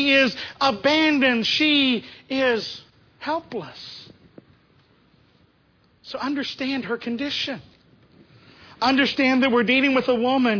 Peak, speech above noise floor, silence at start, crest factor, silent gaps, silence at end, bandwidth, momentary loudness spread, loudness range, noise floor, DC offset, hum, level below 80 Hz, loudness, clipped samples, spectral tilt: -6 dBFS; 39 dB; 0 s; 16 dB; none; 0 s; 5.4 kHz; 17 LU; 14 LU; -60 dBFS; under 0.1%; none; -62 dBFS; -21 LUFS; under 0.1%; -4 dB/octave